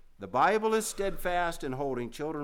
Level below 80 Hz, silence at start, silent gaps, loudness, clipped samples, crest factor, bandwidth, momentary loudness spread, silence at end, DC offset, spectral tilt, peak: -46 dBFS; 0.2 s; none; -30 LUFS; under 0.1%; 16 dB; 18.5 kHz; 9 LU; 0 s; under 0.1%; -4 dB/octave; -14 dBFS